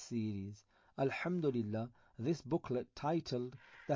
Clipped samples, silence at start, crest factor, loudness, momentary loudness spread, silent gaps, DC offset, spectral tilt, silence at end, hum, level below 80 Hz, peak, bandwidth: under 0.1%; 0 s; 16 dB; -39 LUFS; 13 LU; none; under 0.1%; -7 dB/octave; 0 s; none; -68 dBFS; -24 dBFS; 7.6 kHz